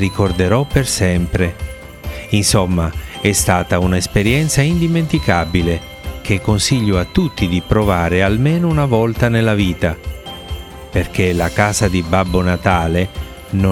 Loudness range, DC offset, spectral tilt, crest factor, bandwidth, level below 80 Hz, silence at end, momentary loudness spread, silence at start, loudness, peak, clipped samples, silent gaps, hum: 2 LU; 0.2%; -5 dB/octave; 16 dB; 16.5 kHz; -30 dBFS; 0 s; 13 LU; 0 s; -16 LUFS; 0 dBFS; under 0.1%; none; none